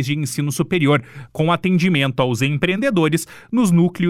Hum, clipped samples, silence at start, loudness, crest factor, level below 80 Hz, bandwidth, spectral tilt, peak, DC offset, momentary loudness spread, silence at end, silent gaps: none; under 0.1%; 0 s; -18 LUFS; 14 dB; -52 dBFS; 15 kHz; -6 dB/octave; -4 dBFS; under 0.1%; 6 LU; 0 s; none